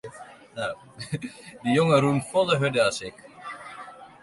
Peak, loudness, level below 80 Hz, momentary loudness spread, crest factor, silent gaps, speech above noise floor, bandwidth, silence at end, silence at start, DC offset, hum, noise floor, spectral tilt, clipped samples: -8 dBFS; -24 LUFS; -62 dBFS; 22 LU; 20 dB; none; 21 dB; 11.5 kHz; 0.15 s; 0.05 s; under 0.1%; none; -46 dBFS; -5.5 dB/octave; under 0.1%